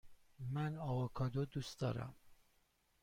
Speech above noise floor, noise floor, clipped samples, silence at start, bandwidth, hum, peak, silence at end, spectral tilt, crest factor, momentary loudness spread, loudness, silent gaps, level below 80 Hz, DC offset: 36 dB; -77 dBFS; under 0.1%; 0.05 s; 16 kHz; none; -30 dBFS; 0.7 s; -7 dB/octave; 14 dB; 7 LU; -42 LUFS; none; -64 dBFS; under 0.1%